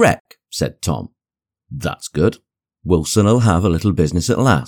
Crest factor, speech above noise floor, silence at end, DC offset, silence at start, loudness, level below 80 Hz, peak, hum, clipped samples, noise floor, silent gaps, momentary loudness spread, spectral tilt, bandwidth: 16 dB; 74 dB; 0 s; under 0.1%; 0 s; -18 LUFS; -36 dBFS; -2 dBFS; none; under 0.1%; -90 dBFS; 0.20-0.25 s; 13 LU; -6 dB/octave; 18.5 kHz